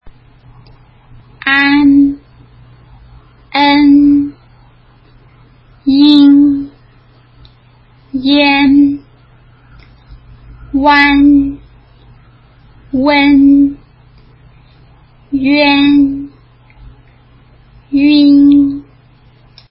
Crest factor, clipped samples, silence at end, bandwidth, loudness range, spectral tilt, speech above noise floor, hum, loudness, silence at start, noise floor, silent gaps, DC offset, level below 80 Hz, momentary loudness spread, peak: 12 dB; under 0.1%; 0.9 s; 5.6 kHz; 4 LU; -7 dB/octave; 37 dB; none; -9 LUFS; 0.05 s; -44 dBFS; none; under 0.1%; -40 dBFS; 14 LU; 0 dBFS